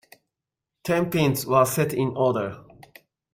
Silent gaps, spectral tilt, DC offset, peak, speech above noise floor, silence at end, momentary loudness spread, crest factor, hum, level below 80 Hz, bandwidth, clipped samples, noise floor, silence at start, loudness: none; -5.5 dB/octave; under 0.1%; -6 dBFS; 64 dB; 0.7 s; 13 LU; 20 dB; none; -58 dBFS; 16.5 kHz; under 0.1%; -86 dBFS; 0.85 s; -23 LUFS